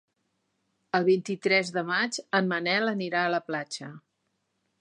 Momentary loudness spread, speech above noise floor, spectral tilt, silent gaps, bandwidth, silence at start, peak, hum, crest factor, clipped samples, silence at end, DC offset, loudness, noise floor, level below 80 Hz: 9 LU; 50 dB; -4.5 dB/octave; none; 11.5 kHz; 0.95 s; -8 dBFS; none; 20 dB; under 0.1%; 0.8 s; under 0.1%; -27 LUFS; -77 dBFS; -82 dBFS